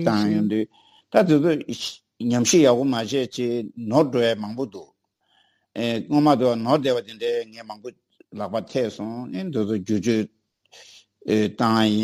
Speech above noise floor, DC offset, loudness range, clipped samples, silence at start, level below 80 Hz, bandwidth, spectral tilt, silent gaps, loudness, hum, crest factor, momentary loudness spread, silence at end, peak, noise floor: 45 dB; under 0.1%; 7 LU; under 0.1%; 0 s; -66 dBFS; 15.5 kHz; -5 dB/octave; none; -22 LUFS; none; 20 dB; 16 LU; 0 s; -4 dBFS; -66 dBFS